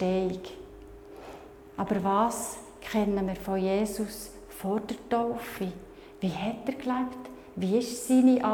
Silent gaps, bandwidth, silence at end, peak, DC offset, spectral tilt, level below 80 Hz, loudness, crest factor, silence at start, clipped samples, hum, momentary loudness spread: none; 18.5 kHz; 0 s; -12 dBFS; under 0.1%; -5.5 dB/octave; -54 dBFS; -29 LUFS; 18 dB; 0 s; under 0.1%; none; 20 LU